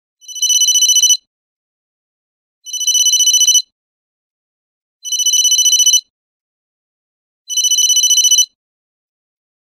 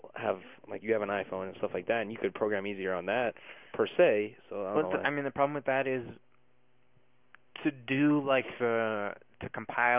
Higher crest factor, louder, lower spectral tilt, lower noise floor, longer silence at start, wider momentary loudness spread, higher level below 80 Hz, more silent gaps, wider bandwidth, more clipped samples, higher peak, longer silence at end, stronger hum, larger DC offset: second, 14 dB vs 20 dB; first, -9 LUFS vs -31 LUFS; second, 10 dB/octave vs -4 dB/octave; first, under -90 dBFS vs -72 dBFS; first, 0.3 s vs 0.05 s; second, 10 LU vs 14 LU; second, -84 dBFS vs -68 dBFS; first, 1.27-2.62 s, 3.72-5.00 s, 6.10-7.45 s vs none; first, 16 kHz vs 3.8 kHz; neither; first, 0 dBFS vs -12 dBFS; first, 1.2 s vs 0 s; neither; neither